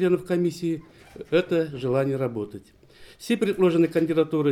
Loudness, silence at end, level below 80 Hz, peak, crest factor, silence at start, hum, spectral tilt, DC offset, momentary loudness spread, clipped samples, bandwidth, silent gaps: -24 LUFS; 0 s; -60 dBFS; -8 dBFS; 16 dB; 0 s; none; -7 dB/octave; under 0.1%; 14 LU; under 0.1%; 14 kHz; none